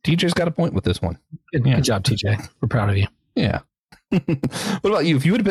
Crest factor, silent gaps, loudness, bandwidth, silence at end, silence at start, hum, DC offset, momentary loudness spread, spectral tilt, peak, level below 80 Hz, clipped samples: 14 dB; 3.79-3.87 s; -21 LUFS; 14 kHz; 0 s; 0.05 s; none; under 0.1%; 7 LU; -6 dB/octave; -6 dBFS; -44 dBFS; under 0.1%